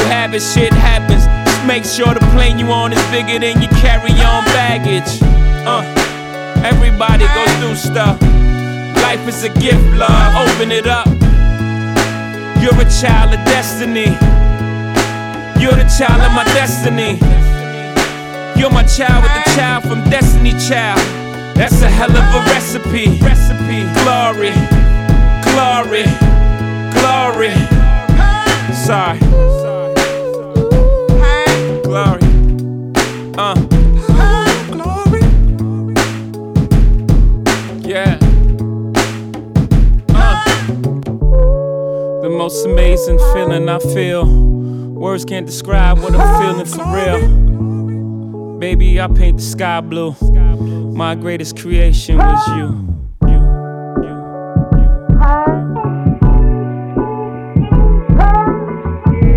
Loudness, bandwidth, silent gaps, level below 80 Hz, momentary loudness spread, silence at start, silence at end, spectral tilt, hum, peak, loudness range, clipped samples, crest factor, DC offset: -13 LUFS; 15 kHz; none; -12 dBFS; 8 LU; 0 s; 0 s; -5.5 dB/octave; none; 0 dBFS; 3 LU; under 0.1%; 10 dB; under 0.1%